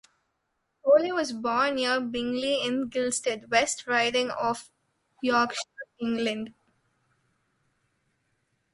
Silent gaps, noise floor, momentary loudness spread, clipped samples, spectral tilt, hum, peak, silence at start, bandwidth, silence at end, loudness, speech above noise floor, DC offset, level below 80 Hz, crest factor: none; -78 dBFS; 11 LU; under 0.1%; -2.5 dB/octave; none; -8 dBFS; 0.85 s; 11.5 kHz; 2.25 s; -27 LUFS; 51 dB; under 0.1%; -66 dBFS; 22 dB